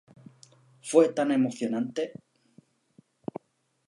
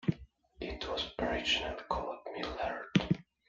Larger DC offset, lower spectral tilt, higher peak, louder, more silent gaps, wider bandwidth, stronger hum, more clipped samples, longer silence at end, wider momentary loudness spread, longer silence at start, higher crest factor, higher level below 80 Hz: neither; about the same, -5.5 dB/octave vs -5.5 dB/octave; first, -8 dBFS vs -12 dBFS; first, -26 LUFS vs -35 LUFS; neither; first, 11.5 kHz vs 7.8 kHz; neither; neither; first, 1.75 s vs 0.25 s; first, 20 LU vs 10 LU; first, 0.85 s vs 0.05 s; about the same, 22 dB vs 24 dB; second, -82 dBFS vs -52 dBFS